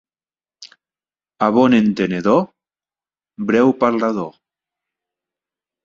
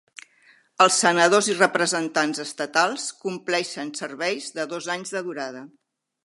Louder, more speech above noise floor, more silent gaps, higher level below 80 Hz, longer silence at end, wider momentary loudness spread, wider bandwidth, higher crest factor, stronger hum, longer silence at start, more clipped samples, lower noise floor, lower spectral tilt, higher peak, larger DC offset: first, -17 LUFS vs -22 LUFS; first, over 75 dB vs 35 dB; neither; first, -60 dBFS vs -78 dBFS; first, 1.55 s vs 0.6 s; about the same, 13 LU vs 14 LU; second, 7.4 kHz vs 11.5 kHz; about the same, 18 dB vs 22 dB; neither; second, 0.6 s vs 0.8 s; neither; first, under -90 dBFS vs -58 dBFS; first, -7 dB/octave vs -2.5 dB/octave; about the same, -2 dBFS vs -2 dBFS; neither